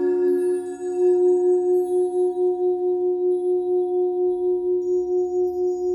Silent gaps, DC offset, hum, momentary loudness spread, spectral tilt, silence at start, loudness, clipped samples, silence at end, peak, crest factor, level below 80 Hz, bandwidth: none; under 0.1%; none; 5 LU; -7 dB/octave; 0 s; -21 LUFS; under 0.1%; 0 s; -12 dBFS; 10 dB; -62 dBFS; 10.5 kHz